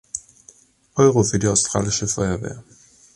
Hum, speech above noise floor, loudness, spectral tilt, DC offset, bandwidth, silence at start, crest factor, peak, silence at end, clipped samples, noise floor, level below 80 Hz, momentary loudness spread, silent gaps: none; 33 dB; -19 LUFS; -4.5 dB/octave; under 0.1%; 11.5 kHz; 0.15 s; 20 dB; -2 dBFS; 0.55 s; under 0.1%; -52 dBFS; -44 dBFS; 17 LU; none